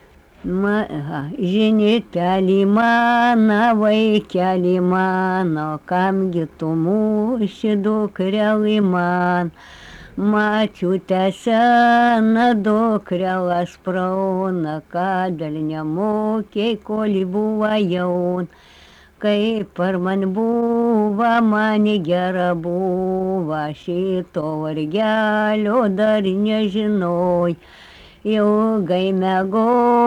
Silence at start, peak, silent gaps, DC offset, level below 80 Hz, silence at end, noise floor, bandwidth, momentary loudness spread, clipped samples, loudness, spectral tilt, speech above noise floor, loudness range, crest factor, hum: 0.45 s; -6 dBFS; none; under 0.1%; -52 dBFS; 0 s; -47 dBFS; 8.8 kHz; 9 LU; under 0.1%; -18 LUFS; -7.5 dB/octave; 29 dB; 5 LU; 12 dB; none